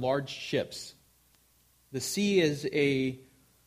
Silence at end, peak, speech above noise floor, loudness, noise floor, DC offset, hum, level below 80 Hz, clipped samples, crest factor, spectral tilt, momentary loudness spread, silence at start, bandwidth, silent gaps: 0.45 s; -14 dBFS; 36 dB; -30 LUFS; -66 dBFS; under 0.1%; none; -66 dBFS; under 0.1%; 18 dB; -4.5 dB/octave; 16 LU; 0 s; 15.5 kHz; none